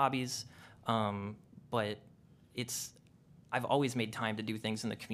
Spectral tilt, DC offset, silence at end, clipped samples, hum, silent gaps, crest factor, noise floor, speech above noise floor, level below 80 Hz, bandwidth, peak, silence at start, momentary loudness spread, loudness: -4.5 dB/octave; under 0.1%; 0 s; under 0.1%; none; none; 22 dB; -62 dBFS; 26 dB; -74 dBFS; 15.5 kHz; -16 dBFS; 0 s; 14 LU; -37 LUFS